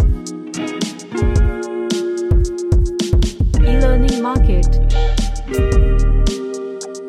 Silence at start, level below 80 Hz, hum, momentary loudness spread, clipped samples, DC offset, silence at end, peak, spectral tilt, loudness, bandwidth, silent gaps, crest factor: 0 s; -16 dBFS; none; 9 LU; under 0.1%; under 0.1%; 0 s; -2 dBFS; -6.5 dB/octave; -18 LUFS; 10.5 kHz; none; 12 dB